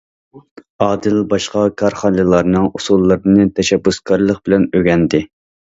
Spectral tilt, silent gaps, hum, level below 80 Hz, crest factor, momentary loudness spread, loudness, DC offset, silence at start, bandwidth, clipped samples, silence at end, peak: -6 dB/octave; 0.51-0.56 s, 0.70-0.79 s; none; -40 dBFS; 14 dB; 5 LU; -14 LUFS; under 0.1%; 0.35 s; 8 kHz; under 0.1%; 0.4 s; 0 dBFS